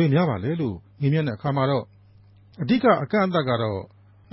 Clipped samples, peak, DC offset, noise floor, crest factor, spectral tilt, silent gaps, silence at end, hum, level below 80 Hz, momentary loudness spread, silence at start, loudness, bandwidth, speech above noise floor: under 0.1%; -6 dBFS; under 0.1%; -52 dBFS; 18 dB; -12 dB/octave; none; 0.45 s; none; -52 dBFS; 10 LU; 0 s; -23 LUFS; 5.8 kHz; 30 dB